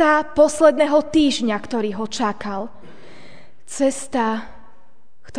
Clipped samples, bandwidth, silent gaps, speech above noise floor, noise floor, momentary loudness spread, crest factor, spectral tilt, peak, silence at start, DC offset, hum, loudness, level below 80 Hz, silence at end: under 0.1%; 10 kHz; none; 41 dB; -59 dBFS; 15 LU; 18 dB; -4 dB/octave; -2 dBFS; 0 s; 2%; none; -19 LUFS; -50 dBFS; 0 s